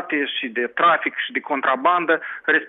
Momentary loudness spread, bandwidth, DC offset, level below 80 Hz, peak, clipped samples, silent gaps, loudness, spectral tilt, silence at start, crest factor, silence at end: 6 LU; 4.1 kHz; under 0.1%; -78 dBFS; -6 dBFS; under 0.1%; none; -20 LUFS; -7 dB/octave; 0 s; 16 dB; 0 s